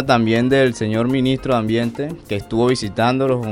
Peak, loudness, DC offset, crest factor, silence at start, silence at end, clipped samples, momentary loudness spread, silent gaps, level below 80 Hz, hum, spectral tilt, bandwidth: -2 dBFS; -18 LUFS; under 0.1%; 16 dB; 0 s; 0 s; under 0.1%; 8 LU; none; -44 dBFS; none; -6.5 dB/octave; 14.5 kHz